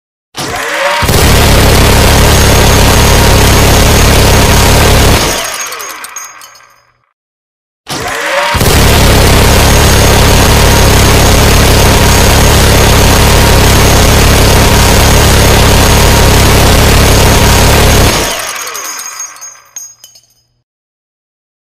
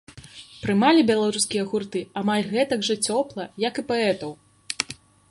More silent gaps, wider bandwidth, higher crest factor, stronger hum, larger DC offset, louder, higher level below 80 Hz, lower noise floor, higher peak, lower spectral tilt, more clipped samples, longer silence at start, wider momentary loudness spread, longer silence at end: first, 7.13-7.84 s vs none; first, 16.5 kHz vs 11.5 kHz; second, 6 dB vs 22 dB; neither; neither; first, -5 LUFS vs -23 LUFS; first, -12 dBFS vs -60 dBFS; about the same, -45 dBFS vs -45 dBFS; about the same, 0 dBFS vs -2 dBFS; about the same, -4 dB/octave vs -4 dB/octave; first, 1% vs under 0.1%; first, 0.3 s vs 0.15 s; second, 12 LU vs 17 LU; first, 0.95 s vs 0.35 s